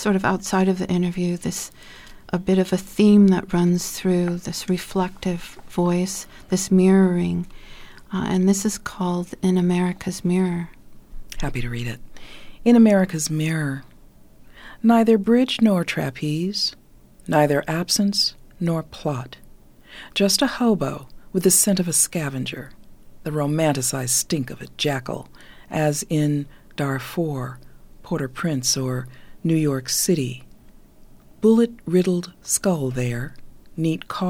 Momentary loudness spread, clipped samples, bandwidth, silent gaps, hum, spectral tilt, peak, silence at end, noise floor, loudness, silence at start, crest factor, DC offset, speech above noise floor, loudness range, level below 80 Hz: 14 LU; under 0.1%; 17.5 kHz; none; none; -5 dB/octave; -6 dBFS; 0 s; -47 dBFS; -21 LUFS; 0 s; 16 dB; under 0.1%; 26 dB; 5 LU; -44 dBFS